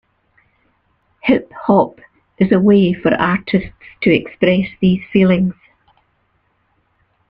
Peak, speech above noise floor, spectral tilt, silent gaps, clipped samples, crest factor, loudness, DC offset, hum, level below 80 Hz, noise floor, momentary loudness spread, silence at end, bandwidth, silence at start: 0 dBFS; 48 dB; -10 dB/octave; none; under 0.1%; 16 dB; -15 LUFS; under 0.1%; none; -48 dBFS; -62 dBFS; 8 LU; 1.75 s; 5.2 kHz; 1.25 s